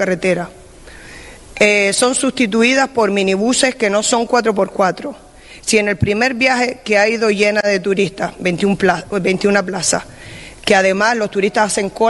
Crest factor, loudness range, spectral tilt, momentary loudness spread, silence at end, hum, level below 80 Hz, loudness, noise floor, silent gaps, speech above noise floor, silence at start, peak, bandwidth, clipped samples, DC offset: 16 dB; 2 LU; -3.5 dB/octave; 11 LU; 0 s; none; -46 dBFS; -15 LUFS; -38 dBFS; none; 23 dB; 0 s; 0 dBFS; 11.5 kHz; under 0.1%; under 0.1%